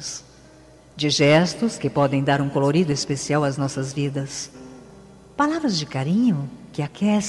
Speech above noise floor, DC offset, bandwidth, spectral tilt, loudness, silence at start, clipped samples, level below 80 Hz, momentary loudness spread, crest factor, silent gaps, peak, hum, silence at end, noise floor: 27 dB; under 0.1%; 12 kHz; -5 dB/octave; -22 LUFS; 0 s; under 0.1%; -56 dBFS; 14 LU; 16 dB; none; -6 dBFS; none; 0 s; -48 dBFS